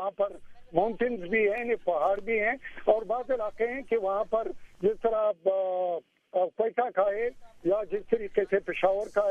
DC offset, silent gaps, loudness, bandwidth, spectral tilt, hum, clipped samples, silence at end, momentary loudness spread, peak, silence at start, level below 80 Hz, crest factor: under 0.1%; none; -29 LUFS; 8.8 kHz; -6.5 dB/octave; none; under 0.1%; 0 s; 5 LU; -8 dBFS; 0 s; -56 dBFS; 20 dB